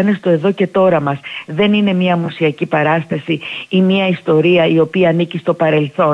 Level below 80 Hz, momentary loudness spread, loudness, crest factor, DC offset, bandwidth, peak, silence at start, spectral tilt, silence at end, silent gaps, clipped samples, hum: -58 dBFS; 8 LU; -14 LUFS; 12 dB; under 0.1%; 6.8 kHz; -2 dBFS; 0 s; -8 dB/octave; 0 s; none; under 0.1%; none